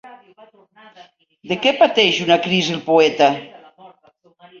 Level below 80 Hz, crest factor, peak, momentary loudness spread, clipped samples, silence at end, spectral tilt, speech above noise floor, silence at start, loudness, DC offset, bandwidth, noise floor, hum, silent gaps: -64 dBFS; 18 dB; 0 dBFS; 6 LU; under 0.1%; 0.75 s; -4 dB/octave; 39 dB; 0.05 s; -16 LUFS; under 0.1%; 7.4 kHz; -55 dBFS; none; none